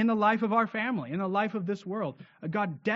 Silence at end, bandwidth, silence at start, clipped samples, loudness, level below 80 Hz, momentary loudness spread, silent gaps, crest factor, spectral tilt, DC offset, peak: 0 s; 7.2 kHz; 0 s; under 0.1%; -29 LUFS; -76 dBFS; 10 LU; none; 18 dB; -5 dB/octave; under 0.1%; -12 dBFS